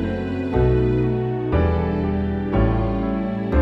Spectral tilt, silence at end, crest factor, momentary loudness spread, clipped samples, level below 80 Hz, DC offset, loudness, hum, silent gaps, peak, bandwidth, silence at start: -10 dB/octave; 0 s; 14 dB; 5 LU; under 0.1%; -28 dBFS; under 0.1%; -21 LUFS; none; none; -4 dBFS; 5.8 kHz; 0 s